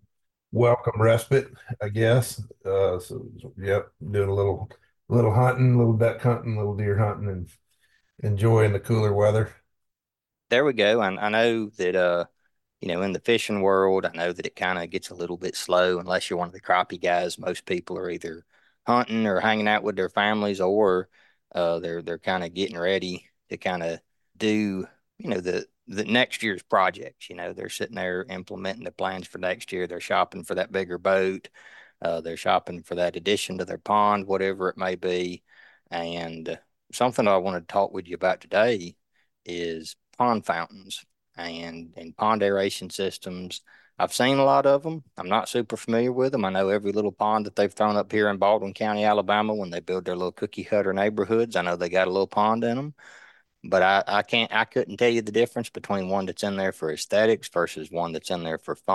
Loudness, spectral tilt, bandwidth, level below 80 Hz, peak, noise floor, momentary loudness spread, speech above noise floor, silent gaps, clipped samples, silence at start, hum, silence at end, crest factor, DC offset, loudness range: -25 LUFS; -5.5 dB/octave; 12.5 kHz; -62 dBFS; -6 dBFS; -89 dBFS; 13 LU; 64 dB; none; under 0.1%; 0.5 s; none; 0 s; 18 dB; under 0.1%; 5 LU